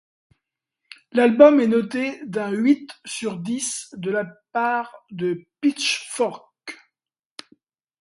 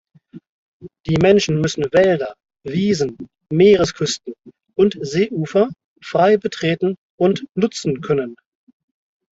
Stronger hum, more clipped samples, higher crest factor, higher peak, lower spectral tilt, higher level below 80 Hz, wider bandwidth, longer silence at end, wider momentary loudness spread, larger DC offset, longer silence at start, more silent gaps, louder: neither; neither; first, 22 dB vs 16 dB; about the same, 0 dBFS vs -2 dBFS; second, -4 dB/octave vs -5.5 dB/octave; second, -70 dBFS vs -52 dBFS; first, 11.5 kHz vs 8 kHz; first, 1.25 s vs 0.95 s; first, 24 LU vs 14 LU; neither; first, 1.15 s vs 0.35 s; second, none vs 0.49-0.80 s, 5.84-5.96 s, 6.98-7.18 s; second, -21 LUFS vs -18 LUFS